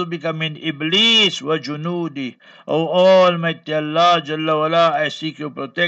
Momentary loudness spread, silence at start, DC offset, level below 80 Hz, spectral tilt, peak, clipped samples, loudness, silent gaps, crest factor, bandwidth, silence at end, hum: 14 LU; 0 s; under 0.1%; -74 dBFS; -4.5 dB/octave; -2 dBFS; under 0.1%; -17 LUFS; none; 14 dB; 8.2 kHz; 0 s; none